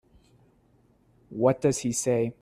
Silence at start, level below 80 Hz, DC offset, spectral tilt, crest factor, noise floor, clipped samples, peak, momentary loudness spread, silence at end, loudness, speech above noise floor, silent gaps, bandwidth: 1.3 s; -62 dBFS; under 0.1%; -5.5 dB/octave; 20 dB; -63 dBFS; under 0.1%; -8 dBFS; 4 LU; 0.1 s; -26 LUFS; 38 dB; none; 14.5 kHz